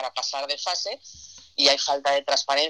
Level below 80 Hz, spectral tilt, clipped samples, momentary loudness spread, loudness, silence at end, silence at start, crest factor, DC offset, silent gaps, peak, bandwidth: -68 dBFS; 0.5 dB/octave; under 0.1%; 18 LU; -23 LUFS; 0 s; 0 s; 22 dB; under 0.1%; none; -2 dBFS; 11.5 kHz